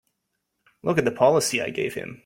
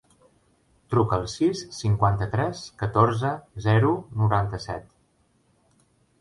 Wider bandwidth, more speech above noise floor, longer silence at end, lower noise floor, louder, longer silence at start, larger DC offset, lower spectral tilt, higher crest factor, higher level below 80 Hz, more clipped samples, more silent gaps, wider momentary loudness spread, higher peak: first, 16.5 kHz vs 11.5 kHz; first, 55 dB vs 42 dB; second, 0.1 s vs 1.4 s; first, -78 dBFS vs -65 dBFS; about the same, -23 LUFS vs -25 LUFS; about the same, 0.85 s vs 0.9 s; neither; second, -4 dB/octave vs -7 dB/octave; about the same, 20 dB vs 20 dB; second, -62 dBFS vs -46 dBFS; neither; neither; about the same, 10 LU vs 9 LU; about the same, -4 dBFS vs -6 dBFS